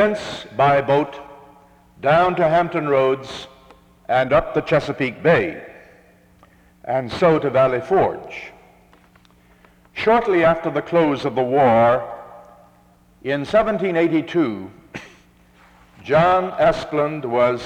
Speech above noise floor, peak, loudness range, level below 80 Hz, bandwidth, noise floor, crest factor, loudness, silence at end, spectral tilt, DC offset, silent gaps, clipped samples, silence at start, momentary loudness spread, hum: 35 dB; -4 dBFS; 3 LU; -48 dBFS; 10 kHz; -53 dBFS; 16 dB; -18 LUFS; 0 s; -7 dB/octave; under 0.1%; none; under 0.1%; 0 s; 19 LU; none